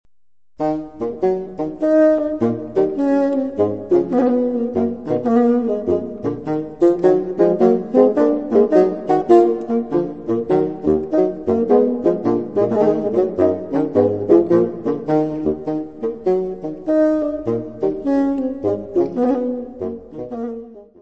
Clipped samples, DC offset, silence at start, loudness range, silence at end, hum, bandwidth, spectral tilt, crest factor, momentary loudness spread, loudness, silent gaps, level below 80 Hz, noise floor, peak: under 0.1%; 0.4%; 0.6 s; 5 LU; 0.2 s; none; 7.4 kHz; -9.5 dB/octave; 16 dB; 10 LU; -18 LUFS; none; -52 dBFS; -81 dBFS; 0 dBFS